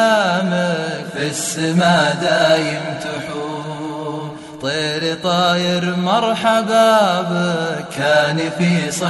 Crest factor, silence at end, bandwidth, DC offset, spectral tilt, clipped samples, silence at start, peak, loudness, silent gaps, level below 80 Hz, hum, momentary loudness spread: 16 dB; 0 s; 12 kHz; under 0.1%; -4.5 dB/octave; under 0.1%; 0 s; -2 dBFS; -17 LUFS; none; -56 dBFS; none; 12 LU